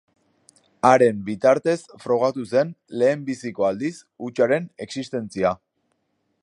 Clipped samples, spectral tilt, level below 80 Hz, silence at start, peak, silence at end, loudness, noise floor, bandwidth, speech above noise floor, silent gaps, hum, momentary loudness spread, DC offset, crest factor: under 0.1%; -6 dB/octave; -62 dBFS; 0.85 s; -2 dBFS; 0.85 s; -22 LUFS; -72 dBFS; 11 kHz; 50 dB; none; none; 13 LU; under 0.1%; 20 dB